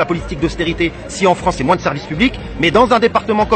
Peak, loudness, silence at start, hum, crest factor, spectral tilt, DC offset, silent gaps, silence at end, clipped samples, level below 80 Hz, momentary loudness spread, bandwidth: 0 dBFS; -15 LUFS; 0 s; none; 14 dB; -5.5 dB/octave; under 0.1%; none; 0 s; under 0.1%; -32 dBFS; 8 LU; 8.8 kHz